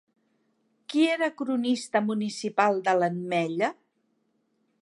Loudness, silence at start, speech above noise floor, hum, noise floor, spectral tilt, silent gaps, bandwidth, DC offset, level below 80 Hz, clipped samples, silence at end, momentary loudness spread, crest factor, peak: -26 LUFS; 0.9 s; 47 dB; none; -73 dBFS; -5 dB/octave; none; 11.5 kHz; under 0.1%; -82 dBFS; under 0.1%; 1.1 s; 6 LU; 20 dB; -8 dBFS